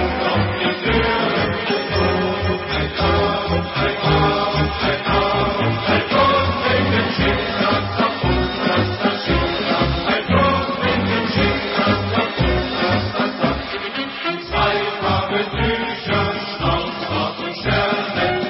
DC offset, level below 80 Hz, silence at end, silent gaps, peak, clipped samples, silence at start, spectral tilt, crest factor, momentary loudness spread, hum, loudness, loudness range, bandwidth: under 0.1%; -32 dBFS; 0 s; none; -4 dBFS; under 0.1%; 0 s; -9.5 dB/octave; 14 dB; 5 LU; none; -19 LUFS; 3 LU; 5.8 kHz